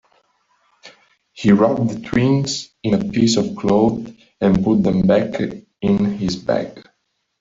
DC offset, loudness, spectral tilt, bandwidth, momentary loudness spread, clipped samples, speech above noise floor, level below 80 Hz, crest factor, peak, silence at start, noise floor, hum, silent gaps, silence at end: under 0.1%; -18 LUFS; -6.5 dB/octave; 7.8 kHz; 9 LU; under 0.1%; 53 dB; -46 dBFS; 16 dB; -2 dBFS; 0.85 s; -70 dBFS; none; none; 0.6 s